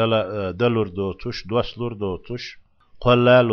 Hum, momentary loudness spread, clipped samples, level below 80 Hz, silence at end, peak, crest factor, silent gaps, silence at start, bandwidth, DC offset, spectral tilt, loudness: none; 15 LU; under 0.1%; -46 dBFS; 0 s; -2 dBFS; 18 dB; none; 0 s; 6.6 kHz; under 0.1%; -7.5 dB/octave; -21 LUFS